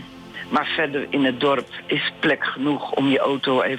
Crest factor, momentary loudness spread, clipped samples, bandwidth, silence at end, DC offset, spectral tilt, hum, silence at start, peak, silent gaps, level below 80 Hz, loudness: 12 dB; 5 LU; under 0.1%; 9.2 kHz; 0 s; under 0.1%; -6 dB/octave; none; 0 s; -10 dBFS; none; -62 dBFS; -21 LUFS